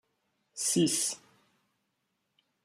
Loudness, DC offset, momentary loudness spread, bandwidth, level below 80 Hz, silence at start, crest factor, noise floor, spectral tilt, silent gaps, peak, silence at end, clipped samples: -29 LUFS; under 0.1%; 18 LU; 15.5 kHz; -80 dBFS; 0.55 s; 20 dB; -80 dBFS; -3 dB/octave; none; -16 dBFS; 1.5 s; under 0.1%